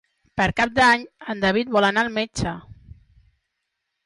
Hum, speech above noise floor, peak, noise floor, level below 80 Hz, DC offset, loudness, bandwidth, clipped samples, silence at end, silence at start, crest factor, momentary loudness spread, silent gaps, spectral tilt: none; 58 dB; -6 dBFS; -79 dBFS; -46 dBFS; under 0.1%; -20 LUFS; 11.5 kHz; under 0.1%; 1.15 s; 0.35 s; 16 dB; 14 LU; none; -4.5 dB/octave